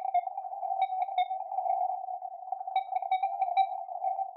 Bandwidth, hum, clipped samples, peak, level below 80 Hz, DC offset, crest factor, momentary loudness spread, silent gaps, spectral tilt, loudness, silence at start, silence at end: 4.2 kHz; none; under 0.1%; -16 dBFS; under -90 dBFS; under 0.1%; 16 dB; 9 LU; none; -1.5 dB/octave; -32 LUFS; 0 s; 0 s